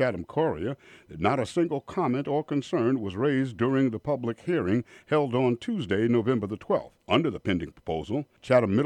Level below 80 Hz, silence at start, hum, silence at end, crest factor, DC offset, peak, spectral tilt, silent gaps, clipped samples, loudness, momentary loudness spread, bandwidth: -58 dBFS; 0 s; none; 0 s; 18 dB; under 0.1%; -8 dBFS; -7.5 dB/octave; none; under 0.1%; -27 LUFS; 7 LU; 10 kHz